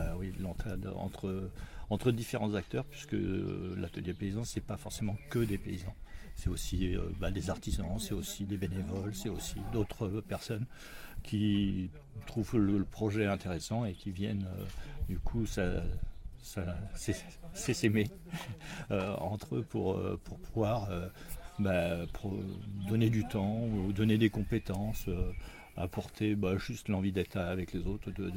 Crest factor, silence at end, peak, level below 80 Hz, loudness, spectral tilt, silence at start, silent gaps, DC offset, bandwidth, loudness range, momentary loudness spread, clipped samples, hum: 20 dB; 0 s; -16 dBFS; -46 dBFS; -36 LUFS; -6.5 dB/octave; 0 s; none; under 0.1%; 16.5 kHz; 5 LU; 12 LU; under 0.1%; none